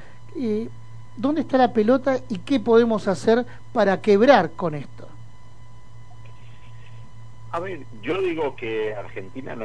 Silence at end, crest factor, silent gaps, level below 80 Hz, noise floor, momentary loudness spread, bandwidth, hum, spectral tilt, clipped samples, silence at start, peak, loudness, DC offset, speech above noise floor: 0 s; 22 dB; none; -54 dBFS; -47 dBFS; 18 LU; 10 kHz; none; -6.5 dB/octave; under 0.1%; 0.3 s; -2 dBFS; -21 LUFS; 2%; 26 dB